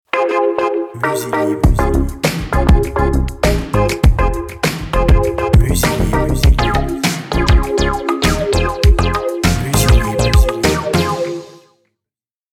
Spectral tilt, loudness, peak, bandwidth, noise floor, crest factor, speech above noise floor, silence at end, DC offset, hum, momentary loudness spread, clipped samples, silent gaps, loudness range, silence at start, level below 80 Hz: -5.5 dB/octave; -15 LUFS; 0 dBFS; 18.5 kHz; -87 dBFS; 14 dB; 74 dB; 1.05 s; under 0.1%; none; 6 LU; under 0.1%; none; 2 LU; 0.15 s; -18 dBFS